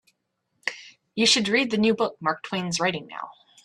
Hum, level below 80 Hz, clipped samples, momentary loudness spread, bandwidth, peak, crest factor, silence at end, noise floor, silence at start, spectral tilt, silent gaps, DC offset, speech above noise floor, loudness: none; -66 dBFS; under 0.1%; 18 LU; 12.5 kHz; -6 dBFS; 20 dB; 0.35 s; -76 dBFS; 0.65 s; -3 dB/octave; none; under 0.1%; 52 dB; -24 LUFS